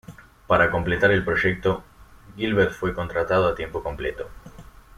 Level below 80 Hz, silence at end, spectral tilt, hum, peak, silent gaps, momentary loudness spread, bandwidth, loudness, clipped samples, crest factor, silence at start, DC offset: -44 dBFS; 0.35 s; -7 dB/octave; none; -4 dBFS; none; 11 LU; 15 kHz; -23 LUFS; under 0.1%; 20 dB; 0.1 s; under 0.1%